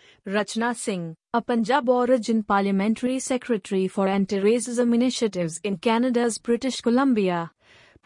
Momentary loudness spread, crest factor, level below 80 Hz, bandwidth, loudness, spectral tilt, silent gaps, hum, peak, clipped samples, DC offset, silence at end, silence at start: 7 LU; 14 dB; -64 dBFS; 11 kHz; -23 LUFS; -5 dB/octave; none; none; -10 dBFS; under 0.1%; under 0.1%; 0.6 s; 0.25 s